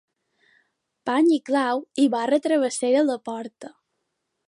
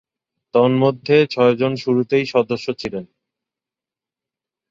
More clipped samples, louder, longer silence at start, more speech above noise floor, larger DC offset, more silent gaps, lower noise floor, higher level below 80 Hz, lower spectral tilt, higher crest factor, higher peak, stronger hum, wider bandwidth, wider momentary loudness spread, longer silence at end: neither; second, -22 LUFS vs -18 LUFS; first, 1.05 s vs 0.55 s; second, 56 dB vs 72 dB; neither; neither; second, -78 dBFS vs -89 dBFS; second, -78 dBFS vs -60 dBFS; second, -3.5 dB/octave vs -7 dB/octave; about the same, 16 dB vs 18 dB; second, -8 dBFS vs 0 dBFS; neither; first, 11.5 kHz vs 7.6 kHz; first, 14 LU vs 11 LU; second, 0.8 s vs 1.65 s